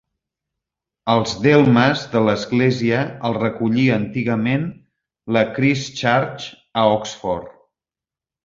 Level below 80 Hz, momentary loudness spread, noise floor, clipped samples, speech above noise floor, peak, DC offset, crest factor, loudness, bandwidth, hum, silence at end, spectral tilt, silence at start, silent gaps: -52 dBFS; 11 LU; -90 dBFS; under 0.1%; 72 dB; -2 dBFS; under 0.1%; 18 dB; -18 LUFS; 7.6 kHz; none; 0.95 s; -6 dB/octave; 1.05 s; none